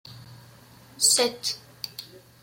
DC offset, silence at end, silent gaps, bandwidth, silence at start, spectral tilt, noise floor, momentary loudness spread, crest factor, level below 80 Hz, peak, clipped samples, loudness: under 0.1%; 0.25 s; none; 16.5 kHz; 0.05 s; -0.5 dB/octave; -51 dBFS; 21 LU; 22 dB; -68 dBFS; -8 dBFS; under 0.1%; -22 LUFS